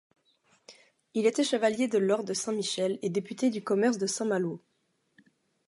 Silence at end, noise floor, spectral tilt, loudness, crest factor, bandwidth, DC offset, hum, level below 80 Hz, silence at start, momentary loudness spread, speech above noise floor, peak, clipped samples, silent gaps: 1.1 s; -75 dBFS; -4 dB/octave; -29 LUFS; 18 dB; 11.5 kHz; under 0.1%; none; -82 dBFS; 0.7 s; 6 LU; 47 dB; -12 dBFS; under 0.1%; none